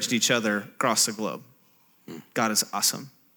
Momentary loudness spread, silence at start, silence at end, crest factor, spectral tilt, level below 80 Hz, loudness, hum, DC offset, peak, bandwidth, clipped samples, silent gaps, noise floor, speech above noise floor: 17 LU; 0 s; 0.25 s; 20 dB; -2 dB/octave; -84 dBFS; -24 LUFS; none; under 0.1%; -8 dBFS; over 20 kHz; under 0.1%; none; -61 dBFS; 35 dB